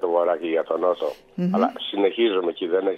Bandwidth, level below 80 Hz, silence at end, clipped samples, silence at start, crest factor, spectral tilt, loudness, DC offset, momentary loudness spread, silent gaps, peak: 6.8 kHz; -68 dBFS; 0 s; under 0.1%; 0 s; 18 dB; -7.5 dB/octave; -23 LUFS; under 0.1%; 5 LU; none; -6 dBFS